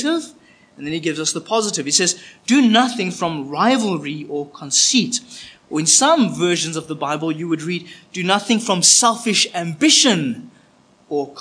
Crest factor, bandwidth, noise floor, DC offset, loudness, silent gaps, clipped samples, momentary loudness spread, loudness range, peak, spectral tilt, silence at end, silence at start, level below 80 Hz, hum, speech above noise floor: 18 dB; 10.5 kHz; -53 dBFS; under 0.1%; -17 LUFS; none; under 0.1%; 15 LU; 3 LU; 0 dBFS; -2.5 dB/octave; 0 s; 0 s; -68 dBFS; none; 35 dB